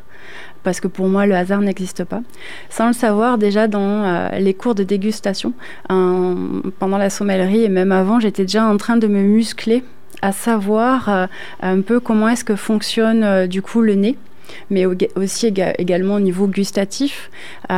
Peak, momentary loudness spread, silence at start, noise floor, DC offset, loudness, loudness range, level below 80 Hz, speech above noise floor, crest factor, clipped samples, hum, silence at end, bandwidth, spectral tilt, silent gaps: -4 dBFS; 10 LU; 0.2 s; -38 dBFS; 3%; -17 LUFS; 3 LU; -56 dBFS; 22 dB; 12 dB; under 0.1%; none; 0 s; 15.5 kHz; -6 dB/octave; none